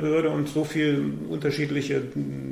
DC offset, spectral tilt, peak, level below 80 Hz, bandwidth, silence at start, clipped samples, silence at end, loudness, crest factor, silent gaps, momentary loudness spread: under 0.1%; -6.5 dB/octave; -14 dBFS; -58 dBFS; 16 kHz; 0 s; under 0.1%; 0 s; -26 LUFS; 12 dB; none; 6 LU